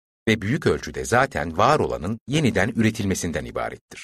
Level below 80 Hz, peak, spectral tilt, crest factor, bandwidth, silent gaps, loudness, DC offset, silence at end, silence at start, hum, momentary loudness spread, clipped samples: -44 dBFS; -4 dBFS; -5 dB/octave; 20 dB; 13.5 kHz; 2.21-2.26 s, 3.81-3.88 s; -23 LUFS; under 0.1%; 0 s; 0.25 s; none; 9 LU; under 0.1%